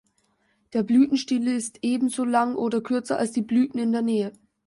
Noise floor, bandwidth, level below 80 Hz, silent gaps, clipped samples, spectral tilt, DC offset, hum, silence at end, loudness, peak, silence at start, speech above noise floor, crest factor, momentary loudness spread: -68 dBFS; 11.5 kHz; -68 dBFS; none; under 0.1%; -5 dB/octave; under 0.1%; none; 0.35 s; -24 LUFS; -10 dBFS; 0.75 s; 45 dB; 14 dB; 7 LU